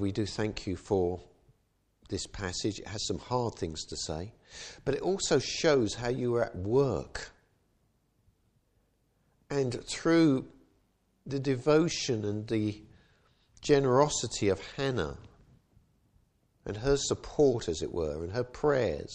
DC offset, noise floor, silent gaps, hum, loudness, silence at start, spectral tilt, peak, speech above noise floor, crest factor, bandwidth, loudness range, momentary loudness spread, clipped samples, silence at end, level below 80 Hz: under 0.1%; -73 dBFS; none; none; -30 LUFS; 0 s; -5 dB/octave; -10 dBFS; 43 dB; 22 dB; 10 kHz; 6 LU; 14 LU; under 0.1%; 0 s; -52 dBFS